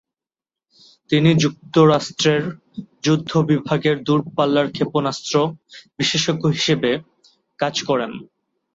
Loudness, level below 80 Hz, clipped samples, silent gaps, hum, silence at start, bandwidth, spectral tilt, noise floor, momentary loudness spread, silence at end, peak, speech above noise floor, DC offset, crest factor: -19 LUFS; -58 dBFS; under 0.1%; none; none; 1.1 s; 7.8 kHz; -5.5 dB/octave; -90 dBFS; 10 LU; 0.5 s; -2 dBFS; 71 dB; under 0.1%; 18 dB